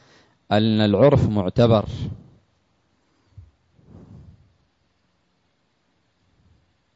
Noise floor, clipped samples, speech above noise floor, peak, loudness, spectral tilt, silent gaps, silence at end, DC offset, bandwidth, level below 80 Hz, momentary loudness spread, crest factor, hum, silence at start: -68 dBFS; under 0.1%; 50 dB; -4 dBFS; -19 LUFS; -8.5 dB/octave; none; 2.8 s; under 0.1%; 7.8 kHz; -48 dBFS; 16 LU; 18 dB; none; 0.5 s